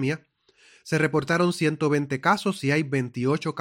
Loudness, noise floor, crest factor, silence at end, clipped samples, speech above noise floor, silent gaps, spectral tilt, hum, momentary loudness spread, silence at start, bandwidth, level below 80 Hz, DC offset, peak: -24 LUFS; -58 dBFS; 20 dB; 0 s; under 0.1%; 34 dB; none; -6 dB/octave; none; 5 LU; 0 s; 16.5 kHz; -64 dBFS; under 0.1%; -6 dBFS